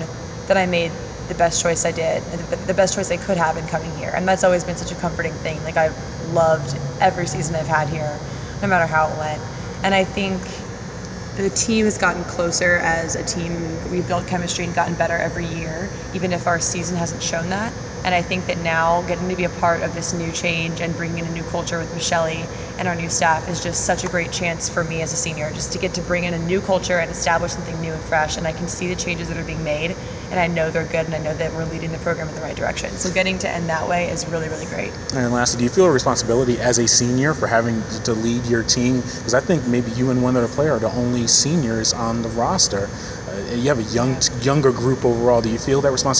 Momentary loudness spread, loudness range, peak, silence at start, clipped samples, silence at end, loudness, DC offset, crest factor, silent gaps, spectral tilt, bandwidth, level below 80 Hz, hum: 9 LU; 5 LU; -2 dBFS; 0 s; under 0.1%; 0 s; -20 LUFS; under 0.1%; 18 dB; none; -4 dB/octave; 8 kHz; -40 dBFS; none